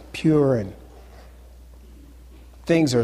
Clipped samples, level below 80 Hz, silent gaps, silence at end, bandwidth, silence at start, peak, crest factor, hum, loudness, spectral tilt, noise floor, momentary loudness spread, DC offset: under 0.1%; -46 dBFS; none; 0 s; 14 kHz; 0 s; -8 dBFS; 16 dB; none; -21 LUFS; -6.5 dB/octave; -45 dBFS; 19 LU; under 0.1%